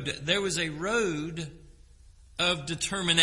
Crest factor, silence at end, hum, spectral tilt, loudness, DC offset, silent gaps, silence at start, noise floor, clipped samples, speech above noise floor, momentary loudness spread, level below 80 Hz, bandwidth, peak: 24 dB; 0 s; none; -3 dB/octave; -28 LUFS; under 0.1%; none; 0 s; -54 dBFS; under 0.1%; 25 dB; 12 LU; -52 dBFS; 11.5 kHz; -6 dBFS